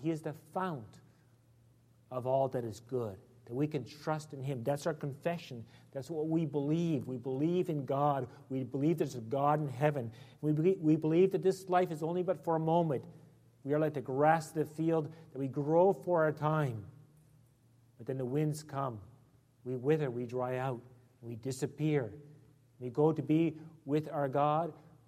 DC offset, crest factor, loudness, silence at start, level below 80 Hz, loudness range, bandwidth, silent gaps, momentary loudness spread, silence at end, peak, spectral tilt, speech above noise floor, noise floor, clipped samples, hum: under 0.1%; 20 dB; -34 LUFS; 0 s; -74 dBFS; 7 LU; 15 kHz; none; 15 LU; 0.3 s; -14 dBFS; -8 dB/octave; 33 dB; -66 dBFS; under 0.1%; none